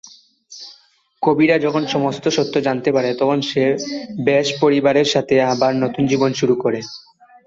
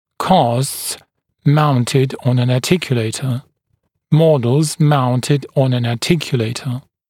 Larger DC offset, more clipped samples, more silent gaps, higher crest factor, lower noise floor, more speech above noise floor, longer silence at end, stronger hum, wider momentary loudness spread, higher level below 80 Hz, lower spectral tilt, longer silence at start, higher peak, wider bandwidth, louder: neither; neither; neither; about the same, 16 dB vs 16 dB; second, -54 dBFS vs -67 dBFS; second, 37 dB vs 52 dB; first, 0.45 s vs 0.3 s; neither; about the same, 12 LU vs 10 LU; about the same, -58 dBFS vs -54 dBFS; about the same, -5 dB/octave vs -6 dB/octave; second, 0.05 s vs 0.2 s; about the same, -2 dBFS vs 0 dBFS; second, 7.8 kHz vs 16.5 kHz; about the same, -17 LUFS vs -16 LUFS